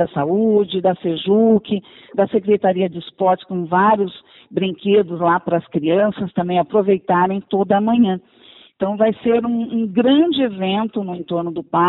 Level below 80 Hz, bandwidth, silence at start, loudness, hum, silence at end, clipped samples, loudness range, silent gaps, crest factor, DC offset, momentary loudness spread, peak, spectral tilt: -58 dBFS; 4.1 kHz; 0 s; -18 LUFS; none; 0 s; under 0.1%; 1 LU; none; 14 dB; under 0.1%; 9 LU; -4 dBFS; -11.5 dB/octave